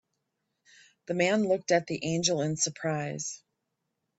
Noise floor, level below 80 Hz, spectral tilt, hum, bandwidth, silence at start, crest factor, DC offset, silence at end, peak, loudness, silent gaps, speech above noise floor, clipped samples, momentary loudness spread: -82 dBFS; -70 dBFS; -4 dB/octave; none; 8.4 kHz; 1.1 s; 20 dB; under 0.1%; 0.85 s; -10 dBFS; -29 LUFS; none; 54 dB; under 0.1%; 10 LU